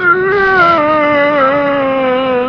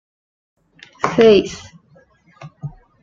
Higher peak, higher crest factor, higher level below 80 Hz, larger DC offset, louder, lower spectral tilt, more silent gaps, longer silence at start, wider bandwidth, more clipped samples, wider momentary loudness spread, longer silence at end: about the same, 0 dBFS vs 0 dBFS; second, 10 dB vs 20 dB; first, -44 dBFS vs -50 dBFS; neither; first, -10 LUFS vs -14 LUFS; about the same, -6.5 dB/octave vs -5.5 dB/octave; neither; second, 0 s vs 1.05 s; second, 6.4 kHz vs 7.6 kHz; neither; second, 4 LU vs 23 LU; second, 0 s vs 0.35 s